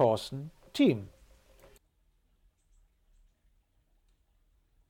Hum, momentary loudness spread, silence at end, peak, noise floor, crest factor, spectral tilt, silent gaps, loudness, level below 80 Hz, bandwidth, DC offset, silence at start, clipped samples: none; 16 LU; 3.8 s; -14 dBFS; -71 dBFS; 20 dB; -6.5 dB/octave; none; -30 LUFS; -64 dBFS; 16.5 kHz; under 0.1%; 0 s; under 0.1%